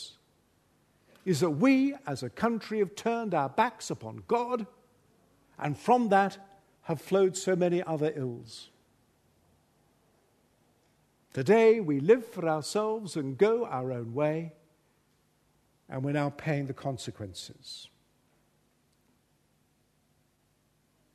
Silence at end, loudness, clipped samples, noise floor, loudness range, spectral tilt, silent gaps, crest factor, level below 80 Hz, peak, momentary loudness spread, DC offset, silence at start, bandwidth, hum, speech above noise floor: 3.3 s; -29 LUFS; under 0.1%; -71 dBFS; 12 LU; -6 dB/octave; none; 22 dB; -72 dBFS; -10 dBFS; 18 LU; under 0.1%; 0 s; 13.5 kHz; none; 42 dB